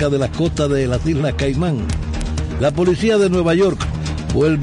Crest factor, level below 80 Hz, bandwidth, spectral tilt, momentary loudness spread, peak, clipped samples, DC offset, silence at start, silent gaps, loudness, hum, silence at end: 12 dB; -28 dBFS; 11 kHz; -6.5 dB/octave; 8 LU; -6 dBFS; under 0.1%; under 0.1%; 0 s; none; -18 LUFS; none; 0 s